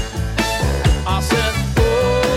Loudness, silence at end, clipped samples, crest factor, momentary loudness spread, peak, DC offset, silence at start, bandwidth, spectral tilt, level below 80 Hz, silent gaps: -18 LUFS; 0 s; under 0.1%; 14 dB; 4 LU; -4 dBFS; under 0.1%; 0 s; 16.5 kHz; -5 dB/octave; -22 dBFS; none